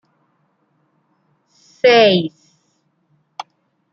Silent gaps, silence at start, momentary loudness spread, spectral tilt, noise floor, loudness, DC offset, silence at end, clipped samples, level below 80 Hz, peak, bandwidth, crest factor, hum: none; 1.85 s; 26 LU; -5.5 dB/octave; -64 dBFS; -13 LUFS; under 0.1%; 1.65 s; under 0.1%; -68 dBFS; -2 dBFS; 7.2 kHz; 18 dB; none